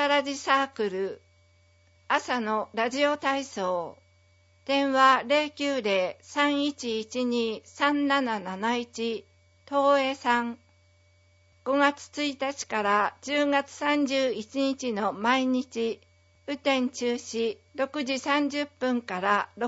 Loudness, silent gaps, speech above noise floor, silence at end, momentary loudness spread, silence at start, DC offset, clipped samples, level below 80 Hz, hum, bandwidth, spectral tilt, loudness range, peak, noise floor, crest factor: -27 LUFS; none; 35 dB; 0 s; 8 LU; 0 s; under 0.1%; under 0.1%; -74 dBFS; none; 8 kHz; -3.5 dB/octave; 3 LU; -8 dBFS; -62 dBFS; 20 dB